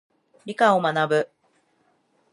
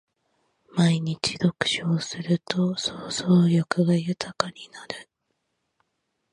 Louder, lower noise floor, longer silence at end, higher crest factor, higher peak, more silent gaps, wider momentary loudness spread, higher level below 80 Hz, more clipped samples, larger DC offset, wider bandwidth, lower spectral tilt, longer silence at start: first, -21 LUFS vs -24 LUFS; second, -66 dBFS vs -77 dBFS; second, 1.05 s vs 1.3 s; about the same, 20 dB vs 22 dB; about the same, -4 dBFS vs -4 dBFS; neither; first, 17 LU vs 14 LU; second, -78 dBFS vs -64 dBFS; neither; neither; about the same, 11 kHz vs 11 kHz; about the same, -5.5 dB/octave vs -5.5 dB/octave; second, 0.45 s vs 0.75 s